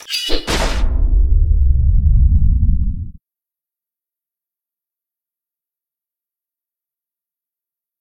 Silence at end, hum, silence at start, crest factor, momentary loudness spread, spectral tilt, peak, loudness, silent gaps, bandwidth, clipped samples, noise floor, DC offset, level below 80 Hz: 4.9 s; none; 0.1 s; 16 dB; 7 LU; -5 dB/octave; 0 dBFS; -17 LUFS; none; 13 kHz; under 0.1%; -89 dBFS; under 0.1%; -18 dBFS